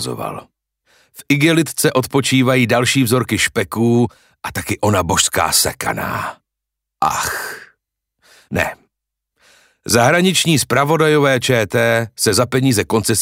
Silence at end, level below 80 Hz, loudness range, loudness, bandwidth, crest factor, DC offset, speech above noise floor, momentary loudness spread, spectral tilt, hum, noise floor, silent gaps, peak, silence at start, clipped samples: 0 s; -48 dBFS; 9 LU; -15 LUFS; 16.5 kHz; 16 dB; under 0.1%; 65 dB; 12 LU; -4 dB/octave; none; -81 dBFS; none; 0 dBFS; 0 s; under 0.1%